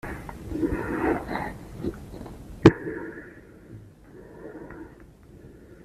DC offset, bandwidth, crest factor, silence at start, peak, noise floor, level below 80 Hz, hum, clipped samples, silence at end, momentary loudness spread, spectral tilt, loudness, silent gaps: under 0.1%; 14 kHz; 26 dB; 0.05 s; -2 dBFS; -49 dBFS; -44 dBFS; none; under 0.1%; 0 s; 29 LU; -7.5 dB/octave; -26 LUFS; none